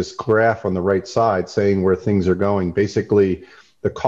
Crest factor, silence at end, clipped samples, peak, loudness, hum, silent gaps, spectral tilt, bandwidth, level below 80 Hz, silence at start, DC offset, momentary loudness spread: 14 dB; 0 s; under 0.1%; -4 dBFS; -19 LUFS; none; none; -7 dB/octave; 7.6 kHz; -42 dBFS; 0 s; under 0.1%; 4 LU